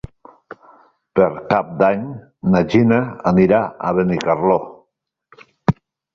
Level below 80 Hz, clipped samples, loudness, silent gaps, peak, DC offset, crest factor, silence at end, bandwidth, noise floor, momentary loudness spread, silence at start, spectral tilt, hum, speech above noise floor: -48 dBFS; under 0.1%; -17 LUFS; none; -2 dBFS; under 0.1%; 16 dB; 0.4 s; 7.2 kHz; -71 dBFS; 10 LU; 1.15 s; -8.5 dB/octave; none; 54 dB